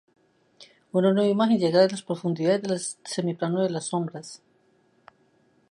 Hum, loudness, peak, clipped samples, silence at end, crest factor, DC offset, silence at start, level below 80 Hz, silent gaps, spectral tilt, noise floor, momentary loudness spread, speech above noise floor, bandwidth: none; -25 LUFS; -8 dBFS; under 0.1%; 1.35 s; 18 dB; under 0.1%; 0.6 s; -74 dBFS; none; -5.5 dB/octave; -64 dBFS; 10 LU; 40 dB; 11.5 kHz